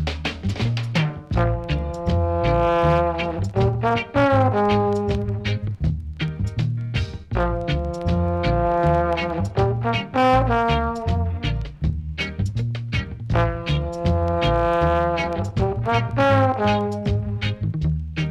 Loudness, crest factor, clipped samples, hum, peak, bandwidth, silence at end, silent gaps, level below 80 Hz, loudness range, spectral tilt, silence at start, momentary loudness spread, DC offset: -22 LUFS; 12 dB; under 0.1%; none; -8 dBFS; 9.2 kHz; 0 s; none; -30 dBFS; 4 LU; -7.5 dB/octave; 0 s; 8 LU; under 0.1%